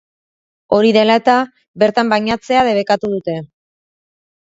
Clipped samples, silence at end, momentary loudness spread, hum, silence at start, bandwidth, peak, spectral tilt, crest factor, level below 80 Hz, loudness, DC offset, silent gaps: under 0.1%; 0.95 s; 10 LU; none; 0.7 s; 7.8 kHz; 0 dBFS; -5.5 dB/octave; 16 dB; -54 dBFS; -14 LUFS; under 0.1%; 1.68-1.74 s